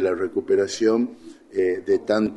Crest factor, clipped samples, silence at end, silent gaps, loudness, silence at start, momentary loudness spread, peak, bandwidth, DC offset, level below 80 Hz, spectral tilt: 14 dB; under 0.1%; 0 s; none; -23 LUFS; 0 s; 6 LU; -8 dBFS; 11 kHz; under 0.1%; -62 dBFS; -5 dB/octave